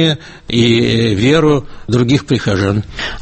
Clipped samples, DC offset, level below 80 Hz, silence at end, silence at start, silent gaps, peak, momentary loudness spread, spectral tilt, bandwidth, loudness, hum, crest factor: under 0.1%; under 0.1%; -36 dBFS; 0 s; 0 s; none; 0 dBFS; 7 LU; -6 dB/octave; 8.8 kHz; -14 LUFS; none; 12 dB